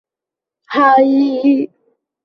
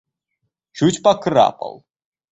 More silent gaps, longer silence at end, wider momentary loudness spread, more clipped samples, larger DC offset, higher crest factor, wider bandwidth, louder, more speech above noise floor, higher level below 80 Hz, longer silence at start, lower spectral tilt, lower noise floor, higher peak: neither; about the same, 0.6 s vs 0.6 s; second, 10 LU vs 16 LU; neither; neither; about the same, 14 dB vs 18 dB; second, 5.8 kHz vs 8.2 kHz; first, -13 LUFS vs -17 LUFS; first, 74 dB vs 59 dB; second, -66 dBFS vs -58 dBFS; about the same, 0.7 s vs 0.75 s; about the same, -6.5 dB/octave vs -5.5 dB/octave; first, -86 dBFS vs -75 dBFS; about the same, -2 dBFS vs -2 dBFS